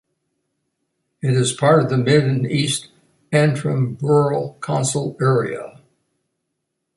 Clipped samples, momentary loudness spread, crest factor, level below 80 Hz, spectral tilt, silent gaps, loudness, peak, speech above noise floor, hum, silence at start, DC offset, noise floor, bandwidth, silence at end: under 0.1%; 9 LU; 18 dB; -58 dBFS; -5.5 dB/octave; none; -19 LUFS; -2 dBFS; 59 dB; none; 1.25 s; under 0.1%; -76 dBFS; 11.5 kHz; 1.25 s